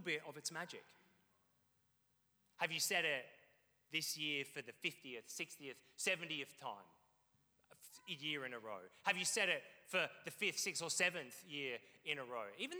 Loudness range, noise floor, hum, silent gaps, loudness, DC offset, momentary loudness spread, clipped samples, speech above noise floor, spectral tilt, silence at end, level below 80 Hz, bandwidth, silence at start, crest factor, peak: 6 LU; -75 dBFS; none; none; -42 LUFS; under 0.1%; 15 LU; under 0.1%; 31 dB; -1.5 dB/octave; 0 s; under -90 dBFS; over 20 kHz; 0 s; 24 dB; -22 dBFS